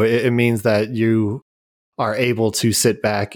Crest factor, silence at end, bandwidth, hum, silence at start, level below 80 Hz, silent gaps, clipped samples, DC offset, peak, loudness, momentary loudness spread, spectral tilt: 14 dB; 0 s; 19.5 kHz; none; 0 s; -58 dBFS; 1.42-1.92 s; under 0.1%; under 0.1%; -4 dBFS; -18 LUFS; 8 LU; -5 dB/octave